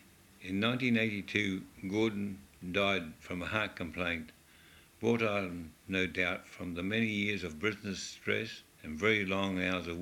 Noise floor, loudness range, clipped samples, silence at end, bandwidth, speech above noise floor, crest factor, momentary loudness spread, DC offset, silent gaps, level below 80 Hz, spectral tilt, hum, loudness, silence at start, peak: -60 dBFS; 2 LU; under 0.1%; 0 s; 16.5 kHz; 25 dB; 22 dB; 12 LU; under 0.1%; none; -62 dBFS; -5 dB/octave; none; -34 LUFS; 0.4 s; -14 dBFS